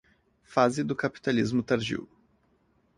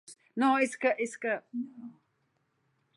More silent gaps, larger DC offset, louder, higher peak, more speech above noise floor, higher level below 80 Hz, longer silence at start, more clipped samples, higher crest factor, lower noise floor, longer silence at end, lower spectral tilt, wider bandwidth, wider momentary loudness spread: neither; neither; about the same, -28 LUFS vs -30 LUFS; first, -8 dBFS vs -14 dBFS; second, 41 dB vs 46 dB; first, -62 dBFS vs -88 dBFS; first, 0.5 s vs 0.1 s; neither; about the same, 22 dB vs 20 dB; second, -68 dBFS vs -76 dBFS; about the same, 0.95 s vs 1.05 s; first, -6 dB/octave vs -4 dB/octave; about the same, 11 kHz vs 11.5 kHz; second, 7 LU vs 18 LU